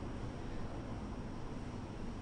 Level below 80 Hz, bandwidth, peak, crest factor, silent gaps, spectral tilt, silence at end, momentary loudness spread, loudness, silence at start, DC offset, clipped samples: -48 dBFS; 10 kHz; -32 dBFS; 12 dB; none; -7 dB/octave; 0 s; 1 LU; -46 LUFS; 0 s; under 0.1%; under 0.1%